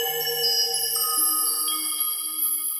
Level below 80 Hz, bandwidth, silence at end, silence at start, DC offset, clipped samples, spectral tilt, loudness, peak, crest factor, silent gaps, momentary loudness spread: -80 dBFS; 16 kHz; 0 s; 0 s; under 0.1%; under 0.1%; 1.5 dB/octave; -21 LUFS; -12 dBFS; 14 dB; none; 4 LU